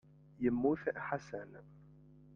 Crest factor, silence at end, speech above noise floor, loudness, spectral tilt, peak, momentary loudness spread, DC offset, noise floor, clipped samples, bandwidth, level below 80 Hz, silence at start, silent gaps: 20 dB; 0.5 s; 23 dB; -37 LUFS; -8 dB/octave; -20 dBFS; 18 LU; under 0.1%; -60 dBFS; under 0.1%; 7 kHz; -66 dBFS; 0.4 s; none